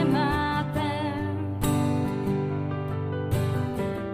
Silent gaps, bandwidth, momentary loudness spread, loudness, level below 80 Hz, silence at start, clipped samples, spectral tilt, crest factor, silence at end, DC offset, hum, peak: none; 16 kHz; 5 LU; -27 LUFS; -46 dBFS; 0 s; under 0.1%; -7 dB/octave; 14 dB; 0 s; under 0.1%; none; -12 dBFS